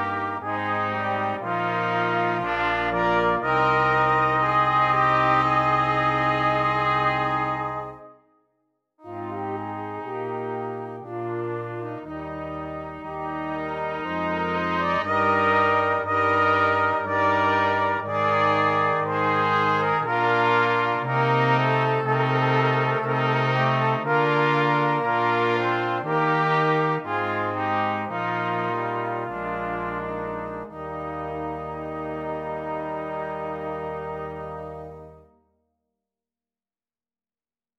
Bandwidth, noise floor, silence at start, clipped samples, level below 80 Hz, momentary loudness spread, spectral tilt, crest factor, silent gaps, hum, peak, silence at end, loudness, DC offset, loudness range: 8.4 kHz; under -90 dBFS; 0 s; under 0.1%; -54 dBFS; 13 LU; -7 dB/octave; 16 dB; none; none; -8 dBFS; 2.6 s; -23 LUFS; under 0.1%; 11 LU